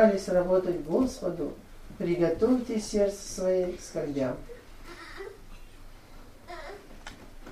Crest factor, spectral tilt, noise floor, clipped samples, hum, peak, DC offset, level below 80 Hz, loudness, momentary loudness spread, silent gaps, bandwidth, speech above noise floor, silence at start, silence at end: 22 dB; -6 dB/octave; -48 dBFS; under 0.1%; none; -8 dBFS; under 0.1%; -48 dBFS; -28 LUFS; 21 LU; none; 15 kHz; 21 dB; 0 s; 0 s